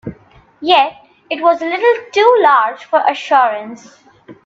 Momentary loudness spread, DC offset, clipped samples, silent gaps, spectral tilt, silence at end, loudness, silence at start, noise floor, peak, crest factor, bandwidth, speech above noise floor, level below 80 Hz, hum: 14 LU; under 0.1%; under 0.1%; none; -4 dB/octave; 0.15 s; -13 LUFS; 0.05 s; -46 dBFS; 0 dBFS; 14 dB; 7.8 kHz; 33 dB; -56 dBFS; none